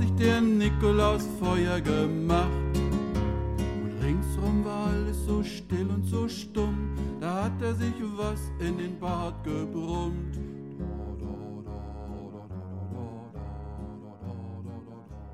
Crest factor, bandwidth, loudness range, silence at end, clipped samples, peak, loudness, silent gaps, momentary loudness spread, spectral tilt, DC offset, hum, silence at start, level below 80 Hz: 18 dB; 15 kHz; 13 LU; 0 s; under 0.1%; -10 dBFS; -30 LUFS; none; 16 LU; -7 dB/octave; 0.1%; none; 0 s; -36 dBFS